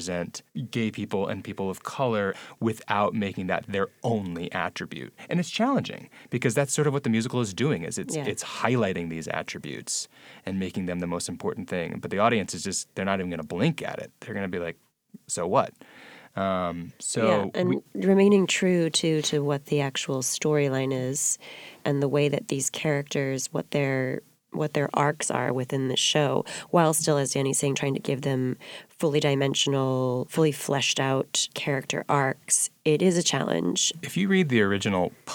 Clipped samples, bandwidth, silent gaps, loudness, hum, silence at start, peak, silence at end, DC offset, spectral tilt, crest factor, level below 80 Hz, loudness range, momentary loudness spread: under 0.1%; over 20 kHz; none; -26 LUFS; none; 0 s; -6 dBFS; 0 s; under 0.1%; -4 dB/octave; 20 dB; -66 dBFS; 6 LU; 10 LU